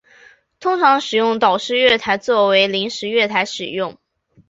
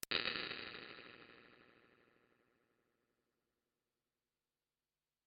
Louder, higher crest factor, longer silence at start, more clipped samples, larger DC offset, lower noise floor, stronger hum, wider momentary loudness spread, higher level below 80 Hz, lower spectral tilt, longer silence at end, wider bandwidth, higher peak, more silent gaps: first, -16 LUFS vs -43 LUFS; second, 16 dB vs 32 dB; first, 0.6 s vs 0 s; neither; neither; second, -49 dBFS vs under -90 dBFS; neither; second, 9 LU vs 24 LU; first, -60 dBFS vs -80 dBFS; first, -3.5 dB/octave vs 0.5 dB/octave; second, 0.6 s vs 3.4 s; first, 8 kHz vs 5.2 kHz; first, -2 dBFS vs -20 dBFS; neither